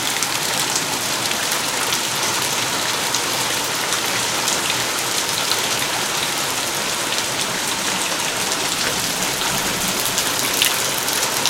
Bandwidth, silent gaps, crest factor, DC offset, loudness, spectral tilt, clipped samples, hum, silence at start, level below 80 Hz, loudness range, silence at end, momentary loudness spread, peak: 17 kHz; none; 20 dB; under 0.1%; -18 LUFS; -0.5 dB/octave; under 0.1%; none; 0 s; -52 dBFS; 1 LU; 0 s; 2 LU; 0 dBFS